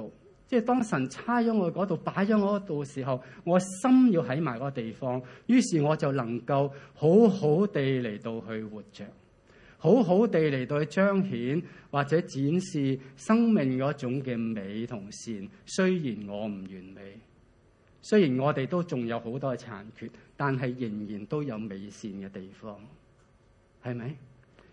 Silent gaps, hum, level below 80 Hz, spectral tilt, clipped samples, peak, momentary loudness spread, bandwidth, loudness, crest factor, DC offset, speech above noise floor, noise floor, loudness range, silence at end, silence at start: none; none; -66 dBFS; -7 dB/octave; under 0.1%; -8 dBFS; 19 LU; 11 kHz; -28 LUFS; 20 dB; under 0.1%; 34 dB; -62 dBFS; 9 LU; 0.45 s; 0 s